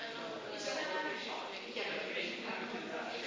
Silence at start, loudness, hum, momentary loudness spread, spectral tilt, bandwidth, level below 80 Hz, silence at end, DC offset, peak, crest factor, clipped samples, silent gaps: 0 s; -40 LUFS; none; 5 LU; -2.5 dB/octave; 7.6 kHz; -82 dBFS; 0 s; under 0.1%; -24 dBFS; 16 dB; under 0.1%; none